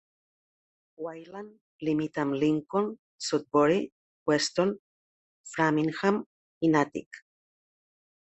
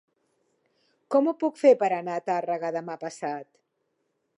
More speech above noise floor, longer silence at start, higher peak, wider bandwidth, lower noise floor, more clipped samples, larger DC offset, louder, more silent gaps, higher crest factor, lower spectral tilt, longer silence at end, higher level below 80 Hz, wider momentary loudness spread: first, over 63 dB vs 51 dB; about the same, 1 s vs 1.1 s; second, -10 dBFS vs -6 dBFS; second, 8.6 kHz vs 11 kHz; first, under -90 dBFS vs -76 dBFS; neither; neither; about the same, -28 LUFS vs -26 LUFS; first, 1.61-1.79 s, 2.99-3.19 s, 3.92-4.26 s, 4.79-5.44 s, 6.26-6.61 s, 7.06-7.11 s vs none; about the same, 20 dB vs 20 dB; about the same, -5 dB/octave vs -6 dB/octave; first, 1.2 s vs 0.95 s; first, -70 dBFS vs -86 dBFS; first, 17 LU vs 14 LU